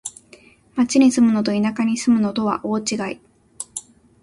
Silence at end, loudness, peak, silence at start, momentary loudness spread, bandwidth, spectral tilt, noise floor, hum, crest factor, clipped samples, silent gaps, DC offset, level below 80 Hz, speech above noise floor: 0.4 s; -19 LUFS; -4 dBFS; 0.05 s; 18 LU; 11.5 kHz; -4.5 dB/octave; -50 dBFS; none; 16 dB; under 0.1%; none; under 0.1%; -58 dBFS; 32 dB